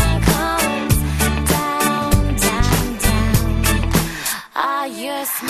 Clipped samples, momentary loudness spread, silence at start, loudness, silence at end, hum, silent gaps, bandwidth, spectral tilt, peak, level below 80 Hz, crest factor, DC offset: under 0.1%; 5 LU; 0 s; -18 LUFS; 0 s; none; none; 14 kHz; -4.5 dB/octave; -2 dBFS; -24 dBFS; 16 dB; under 0.1%